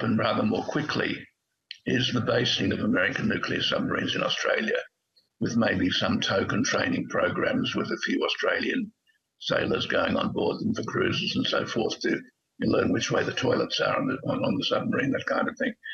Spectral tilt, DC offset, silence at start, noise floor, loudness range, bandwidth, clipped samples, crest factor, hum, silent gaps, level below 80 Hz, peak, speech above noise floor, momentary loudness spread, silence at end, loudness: -4.5 dB/octave; under 0.1%; 0 s; -69 dBFS; 2 LU; 7.6 kHz; under 0.1%; 18 dB; none; none; -62 dBFS; -10 dBFS; 43 dB; 5 LU; 0 s; -26 LUFS